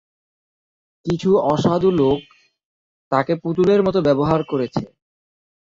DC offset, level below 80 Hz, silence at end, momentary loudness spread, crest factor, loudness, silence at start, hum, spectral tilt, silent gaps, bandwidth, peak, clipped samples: under 0.1%; -50 dBFS; 0.9 s; 9 LU; 18 dB; -19 LUFS; 1.05 s; none; -7.5 dB/octave; 2.65-3.11 s; 7.6 kHz; -2 dBFS; under 0.1%